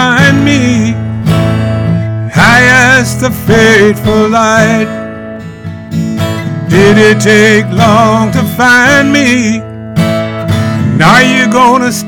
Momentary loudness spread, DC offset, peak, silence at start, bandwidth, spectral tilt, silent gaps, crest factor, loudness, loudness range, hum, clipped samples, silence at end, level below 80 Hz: 12 LU; under 0.1%; 0 dBFS; 0 s; 19 kHz; -5 dB/octave; none; 8 dB; -7 LUFS; 3 LU; none; 2%; 0 s; -34 dBFS